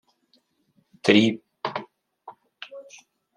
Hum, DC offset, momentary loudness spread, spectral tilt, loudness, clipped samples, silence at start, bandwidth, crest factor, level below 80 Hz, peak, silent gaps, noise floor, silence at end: none; under 0.1%; 24 LU; -5 dB/octave; -23 LUFS; under 0.1%; 1.05 s; 10.5 kHz; 26 dB; -72 dBFS; -2 dBFS; none; -67 dBFS; 0.55 s